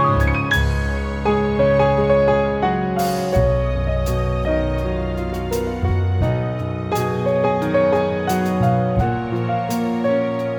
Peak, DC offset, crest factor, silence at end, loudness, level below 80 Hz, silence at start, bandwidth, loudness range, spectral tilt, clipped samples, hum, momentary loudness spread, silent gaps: -4 dBFS; under 0.1%; 14 dB; 0 s; -19 LUFS; -28 dBFS; 0 s; over 20 kHz; 3 LU; -7 dB/octave; under 0.1%; none; 7 LU; none